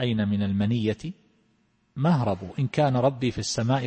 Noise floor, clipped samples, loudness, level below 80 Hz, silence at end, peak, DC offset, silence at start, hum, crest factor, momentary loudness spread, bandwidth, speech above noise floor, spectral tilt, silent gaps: -67 dBFS; under 0.1%; -25 LUFS; -56 dBFS; 0 s; -10 dBFS; under 0.1%; 0 s; none; 16 dB; 7 LU; 8.8 kHz; 43 dB; -6.5 dB/octave; none